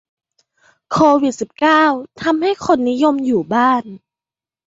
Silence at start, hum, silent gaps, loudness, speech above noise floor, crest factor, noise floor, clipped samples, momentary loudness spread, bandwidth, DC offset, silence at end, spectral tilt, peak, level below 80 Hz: 0.9 s; none; none; -15 LUFS; over 75 dB; 16 dB; under -90 dBFS; under 0.1%; 8 LU; 8 kHz; under 0.1%; 0.7 s; -5 dB/octave; 0 dBFS; -54 dBFS